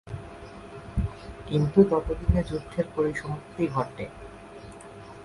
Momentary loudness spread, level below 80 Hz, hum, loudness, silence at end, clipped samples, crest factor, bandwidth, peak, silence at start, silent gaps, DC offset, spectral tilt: 22 LU; -38 dBFS; none; -27 LUFS; 0 s; under 0.1%; 22 dB; 11.5 kHz; -6 dBFS; 0.05 s; none; under 0.1%; -8 dB/octave